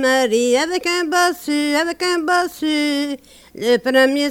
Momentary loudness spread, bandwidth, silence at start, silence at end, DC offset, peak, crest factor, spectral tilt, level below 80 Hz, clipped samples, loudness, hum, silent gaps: 6 LU; 17 kHz; 0 s; 0 s; under 0.1%; -2 dBFS; 16 dB; -2 dB/octave; -58 dBFS; under 0.1%; -17 LUFS; none; none